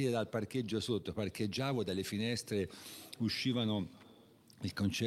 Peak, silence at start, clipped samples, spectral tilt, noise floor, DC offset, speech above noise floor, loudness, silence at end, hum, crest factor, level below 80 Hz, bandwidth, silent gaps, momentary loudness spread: -22 dBFS; 0 s; under 0.1%; -5.5 dB/octave; -62 dBFS; under 0.1%; 25 dB; -37 LUFS; 0 s; none; 16 dB; -66 dBFS; 16 kHz; none; 9 LU